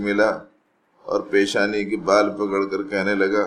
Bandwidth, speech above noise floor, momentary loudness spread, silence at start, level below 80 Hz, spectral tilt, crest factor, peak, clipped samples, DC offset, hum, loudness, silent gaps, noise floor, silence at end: 11.5 kHz; 41 dB; 8 LU; 0 s; -60 dBFS; -4.5 dB/octave; 20 dB; -2 dBFS; under 0.1%; under 0.1%; none; -21 LUFS; none; -62 dBFS; 0 s